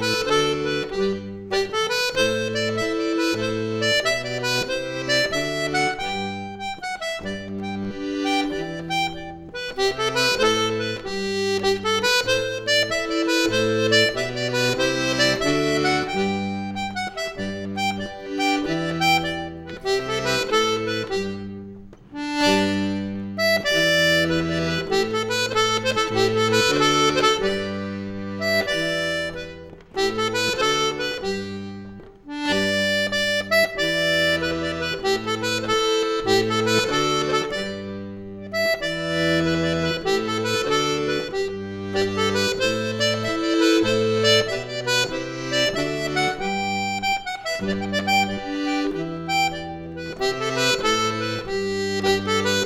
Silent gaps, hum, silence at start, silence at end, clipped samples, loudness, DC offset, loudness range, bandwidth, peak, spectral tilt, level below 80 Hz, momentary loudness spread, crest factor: none; none; 0 s; 0 s; under 0.1%; -22 LUFS; under 0.1%; 4 LU; 17.5 kHz; -4 dBFS; -3.5 dB/octave; -48 dBFS; 11 LU; 18 dB